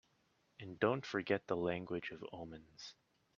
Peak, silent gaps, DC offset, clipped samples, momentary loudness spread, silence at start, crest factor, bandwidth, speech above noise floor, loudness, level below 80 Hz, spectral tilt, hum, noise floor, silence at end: -18 dBFS; none; under 0.1%; under 0.1%; 17 LU; 0.6 s; 24 dB; 7.4 kHz; 37 dB; -40 LUFS; -74 dBFS; -6 dB/octave; none; -77 dBFS; 0.45 s